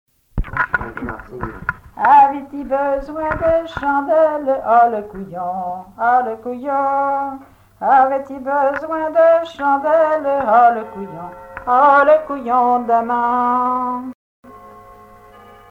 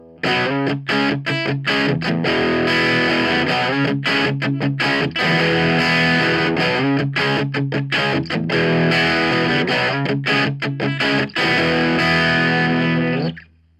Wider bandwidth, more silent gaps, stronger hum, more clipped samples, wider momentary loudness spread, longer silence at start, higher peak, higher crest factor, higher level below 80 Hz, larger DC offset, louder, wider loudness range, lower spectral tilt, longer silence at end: second, 7.4 kHz vs 12 kHz; first, 14.15-14.43 s vs none; neither; neither; first, 16 LU vs 5 LU; first, 0.35 s vs 0.05 s; about the same, -2 dBFS vs -4 dBFS; about the same, 14 dB vs 14 dB; first, -40 dBFS vs -50 dBFS; neither; about the same, -16 LUFS vs -17 LUFS; first, 4 LU vs 1 LU; first, -7.5 dB/octave vs -6 dB/octave; first, 0.8 s vs 0.4 s